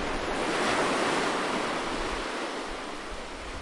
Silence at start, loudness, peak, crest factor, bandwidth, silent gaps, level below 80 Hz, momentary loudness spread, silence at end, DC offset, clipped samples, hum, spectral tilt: 0 s; -29 LUFS; -16 dBFS; 14 dB; 11.5 kHz; none; -44 dBFS; 12 LU; 0 s; under 0.1%; under 0.1%; none; -3 dB/octave